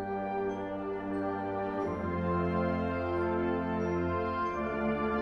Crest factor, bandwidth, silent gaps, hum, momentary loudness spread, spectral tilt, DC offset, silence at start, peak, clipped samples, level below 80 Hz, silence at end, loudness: 12 dB; 6.6 kHz; none; none; 4 LU; -8.5 dB/octave; under 0.1%; 0 s; -20 dBFS; under 0.1%; -52 dBFS; 0 s; -33 LUFS